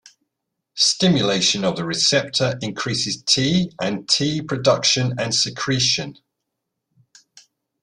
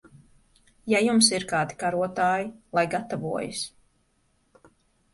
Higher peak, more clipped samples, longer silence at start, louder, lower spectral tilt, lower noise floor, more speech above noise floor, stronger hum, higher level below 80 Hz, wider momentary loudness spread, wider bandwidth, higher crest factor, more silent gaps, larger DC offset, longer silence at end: first, -2 dBFS vs -6 dBFS; neither; about the same, 0.75 s vs 0.85 s; first, -19 LUFS vs -25 LUFS; about the same, -3.5 dB/octave vs -3 dB/octave; first, -79 dBFS vs -68 dBFS; first, 59 dB vs 43 dB; neither; first, -56 dBFS vs -64 dBFS; second, 7 LU vs 13 LU; about the same, 11 kHz vs 11.5 kHz; about the same, 20 dB vs 22 dB; neither; neither; first, 1.7 s vs 1.45 s